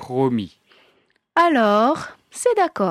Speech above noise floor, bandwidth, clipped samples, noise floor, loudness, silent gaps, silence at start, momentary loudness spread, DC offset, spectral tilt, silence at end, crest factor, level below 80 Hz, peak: 44 dB; 14 kHz; under 0.1%; -62 dBFS; -19 LUFS; none; 0 s; 11 LU; under 0.1%; -5 dB/octave; 0 s; 14 dB; -62 dBFS; -6 dBFS